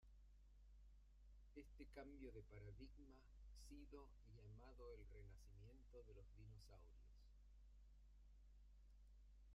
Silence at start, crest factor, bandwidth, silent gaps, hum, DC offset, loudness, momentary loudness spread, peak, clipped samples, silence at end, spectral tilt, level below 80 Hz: 0 s; 16 dB; 10 kHz; none; none; under 0.1%; -64 LUFS; 7 LU; -46 dBFS; under 0.1%; 0 s; -6.5 dB/octave; -66 dBFS